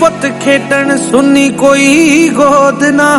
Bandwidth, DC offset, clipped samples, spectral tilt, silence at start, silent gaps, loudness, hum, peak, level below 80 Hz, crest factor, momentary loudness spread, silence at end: 14 kHz; under 0.1%; 3%; -4 dB/octave; 0 s; none; -8 LUFS; none; 0 dBFS; -44 dBFS; 8 dB; 5 LU; 0 s